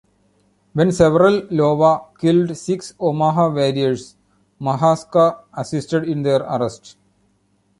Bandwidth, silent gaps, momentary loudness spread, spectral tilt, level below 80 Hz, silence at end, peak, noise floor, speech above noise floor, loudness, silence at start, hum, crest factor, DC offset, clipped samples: 11.5 kHz; none; 11 LU; -7 dB/octave; -52 dBFS; 1.05 s; -2 dBFS; -62 dBFS; 45 dB; -18 LUFS; 0.75 s; none; 16 dB; under 0.1%; under 0.1%